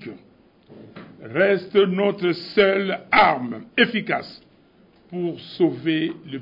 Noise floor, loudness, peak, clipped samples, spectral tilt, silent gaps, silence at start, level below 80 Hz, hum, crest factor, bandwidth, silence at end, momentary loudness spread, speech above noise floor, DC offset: -55 dBFS; -21 LUFS; -4 dBFS; under 0.1%; -8 dB/octave; none; 0 s; -60 dBFS; none; 18 dB; 5.4 kHz; 0 s; 12 LU; 34 dB; under 0.1%